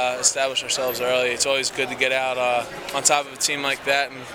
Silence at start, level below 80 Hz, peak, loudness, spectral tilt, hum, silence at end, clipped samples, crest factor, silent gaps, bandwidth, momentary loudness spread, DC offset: 0 s; -60 dBFS; -2 dBFS; -21 LUFS; -0.5 dB/octave; none; 0 s; under 0.1%; 20 dB; none; 19.5 kHz; 4 LU; under 0.1%